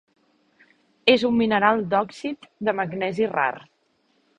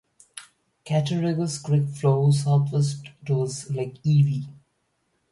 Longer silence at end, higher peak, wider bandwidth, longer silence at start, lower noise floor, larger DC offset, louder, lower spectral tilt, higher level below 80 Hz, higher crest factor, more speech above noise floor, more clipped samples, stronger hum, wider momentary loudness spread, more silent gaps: about the same, 0.8 s vs 0.8 s; first, 0 dBFS vs -8 dBFS; second, 9.8 kHz vs 11.5 kHz; first, 1.05 s vs 0.35 s; second, -67 dBFS vs -72 dBFS; neither; about the same, -22 LUFS vs -24 LUFS; about the same, -6 dB/octave vs -7 dB/octave; about the same, -62 dBFS vs -62 dBFS; first, 24 dB vs 16 dB; second, 44 dB vs 50 dB; neither; neither; second, 12 LU vs 19 LU; neither